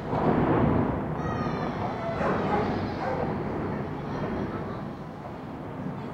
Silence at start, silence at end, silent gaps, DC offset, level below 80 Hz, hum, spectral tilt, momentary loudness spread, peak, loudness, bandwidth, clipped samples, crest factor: 0 s; 0 s; none; under 0.1%; -46 dBFS; none; -8.5 dB/octave; 14 LU; -12 dBFS; -29 LUFS; 8.2 kHz; under 0.1%; 16 dB